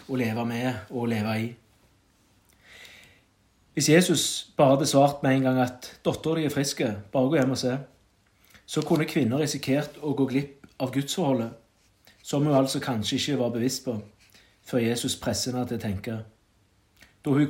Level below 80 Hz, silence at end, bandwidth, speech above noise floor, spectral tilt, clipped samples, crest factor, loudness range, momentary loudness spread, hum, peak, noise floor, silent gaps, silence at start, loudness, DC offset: -64 dBFS; 0 s; 16.5 kHz; 39 dB; -5 dB/octave; under 0.1%; 20 dB; 7 LU; 13 LU; none; -6 dBFS; -64 dBFS; none; 0.1 s; -26 LUFS; under 0.1%